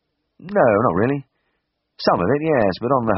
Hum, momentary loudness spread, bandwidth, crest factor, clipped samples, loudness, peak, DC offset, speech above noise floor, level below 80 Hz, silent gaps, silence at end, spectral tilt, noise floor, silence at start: none; 7 LU; 5.8 kHz; 18 dB; under 0.1%; -19 LUFS; -2 dBFS; under 0.1%; 55 dB; -52 dBFS; none; 0 s; -5.5 dB/octave; -73 dBFS; 0.4 s